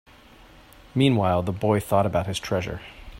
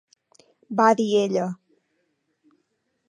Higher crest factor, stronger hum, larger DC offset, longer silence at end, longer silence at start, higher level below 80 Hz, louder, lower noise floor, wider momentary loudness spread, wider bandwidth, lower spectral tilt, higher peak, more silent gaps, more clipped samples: about the same, 18 dB vs 22 dB; neither; neither; second, 0 s vs 1.55 s; first, 0.95 s vs 0.7 s; first, -48 dBFS vs -78 dBFS; about the same, -24 LUFS vs -22 LUFS; second, -50 dBFS vs -73 dBFS; second, 10 LU vs 13 LU; first, 16 kHz vs 11 kHz; about the same, -6.5 dB/octave vs -5.5 dB/octave; about the same, -6 dBFS vs -4 dBFS; neither; neither